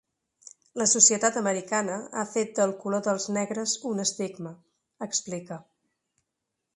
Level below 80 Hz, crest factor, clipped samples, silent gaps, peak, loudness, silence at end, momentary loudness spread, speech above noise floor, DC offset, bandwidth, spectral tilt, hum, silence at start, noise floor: -74 dBFS; 26 dB; under 0.1%; none; -4 dBFS; -25 LUFS; 1.15 s; 22 LU; 56 dB; under 0.1%; 11.5 kHz; -2.5 dB/octave; none; 0.75 s; -83 dBFS